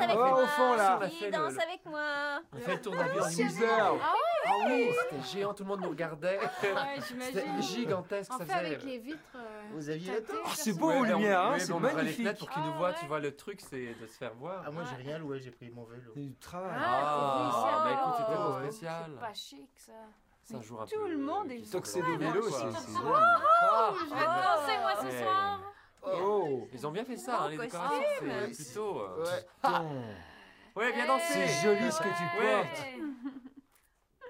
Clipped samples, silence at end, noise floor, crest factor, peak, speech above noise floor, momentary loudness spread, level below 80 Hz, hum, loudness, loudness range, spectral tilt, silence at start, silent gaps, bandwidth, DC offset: under 0.1%; 0 s; -70 dBFS; 18 dB; -14 dBFS; 38 dB; 16 LU; -74 dBFS; none; -31 LUFS; 9 LU; -4.5 dB/octave; 0 s; none; 16 kHz; under 0.1%